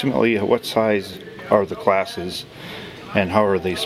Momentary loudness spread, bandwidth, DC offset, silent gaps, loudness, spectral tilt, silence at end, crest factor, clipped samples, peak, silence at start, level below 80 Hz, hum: 16 LU; 15.5 kHz; under 0.1%; none; -20 LUFS; -5.5 dB/octave; 0 s; 20 dB; under 0.1%; 0 dBFS; 0 s; -56 dBFS; none